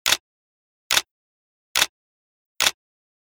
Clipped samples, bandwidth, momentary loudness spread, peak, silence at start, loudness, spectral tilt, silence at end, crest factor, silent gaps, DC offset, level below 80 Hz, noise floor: under 0.1%; over 20 kHz; 2 LU; -2 dBFS; 0.05 s; -22 LUFS; 1.5 dB/octave; 0.55 s; 26 dB; 0.20-0.90 s, 1.11-1.75 s, 1.89-2.55 s; under 0.1%; -60 dBFS; under -90 dBFS